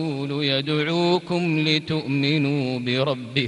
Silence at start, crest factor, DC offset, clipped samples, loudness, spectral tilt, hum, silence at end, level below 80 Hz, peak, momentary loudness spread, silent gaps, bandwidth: 0 s; 18 dB; under 0.1%; under 0.1%; -22 LUFS; -6.5 dB/octave; none; 0 s; -62 dBFS; -6 dBFS; 4 LU; none; 11 kHz